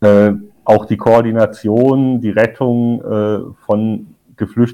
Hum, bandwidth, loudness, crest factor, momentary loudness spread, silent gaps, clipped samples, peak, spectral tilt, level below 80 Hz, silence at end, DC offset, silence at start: none; 10.5 kHz; -14 LUFS; 12 dB; 9 LU; none; under 0.1%; 0 dBFS; -9 dB/octave; -50 dBFS; 0 s; under 0.1%; 0 s